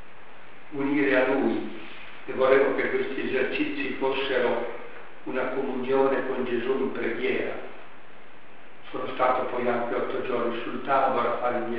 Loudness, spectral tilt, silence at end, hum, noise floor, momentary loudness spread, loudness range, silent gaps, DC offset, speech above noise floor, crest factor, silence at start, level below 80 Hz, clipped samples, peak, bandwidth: -26 LUFS; -3 dB/octave; 0 s; none; -50 dBFS; 17 LU; 4 LU; none; 2%; 25 dB; 22 dB; 0.1 s; -62 dBFS; under 0.1%; -4 dBFS; 5.2 kHz